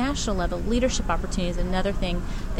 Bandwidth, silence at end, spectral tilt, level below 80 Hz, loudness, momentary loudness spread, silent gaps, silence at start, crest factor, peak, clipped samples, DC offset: 12 kHz; 0 s; -5 dB/octave; -28 dBFS; -27 LUFS; 5 LU; none; 0 s; 14 dB; -10 dBFS; under 0.1%; under 0.1%